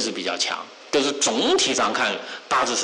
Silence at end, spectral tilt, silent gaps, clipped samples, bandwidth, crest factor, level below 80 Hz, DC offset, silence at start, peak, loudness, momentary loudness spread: 0 s; -1 dB/octave; none; under 0.1%; 11 kHz; 12 dB; -62 dBFS; under 0.1%; 0 s; -12 dBFS; -22 LUFS; 6 LU